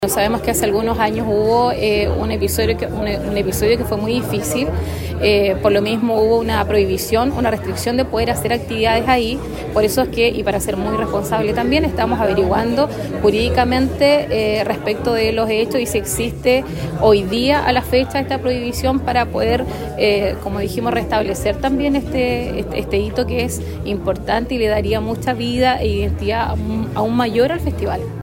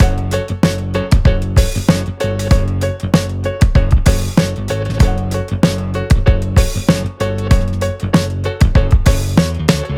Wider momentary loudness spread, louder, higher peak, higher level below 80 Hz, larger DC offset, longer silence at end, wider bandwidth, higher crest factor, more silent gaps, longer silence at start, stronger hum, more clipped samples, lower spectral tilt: about the same, 6 LU vs 6 LU; second, -18 LUFS vs -15 LUFS; about the same, 0 dBFS vs 0 dBFS; second, -30 dBFS vs -18 dBFS; neither; about the same, 0 s vs 0 s; about the same, 16.5 kHz vs 16.5 kHz; about the same, 18 dB vs 14 dB; neither; about the same, 0 s vs 0 s; neither; neither; about the same, -5 dB/octave vs -6 dB/octave